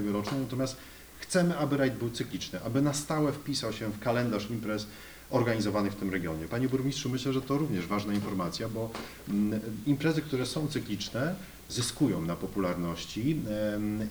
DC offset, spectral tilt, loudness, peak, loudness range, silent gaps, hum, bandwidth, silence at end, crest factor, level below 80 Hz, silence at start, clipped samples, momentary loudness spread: under 0.1%; -5.5 dB/octave; -31 LUFS; -14 dBFS; 1 LU; none; none; over 20 kHz; 0 s; 18 dB; -56 dBFS; 0 s; under 0.1%; 7 LU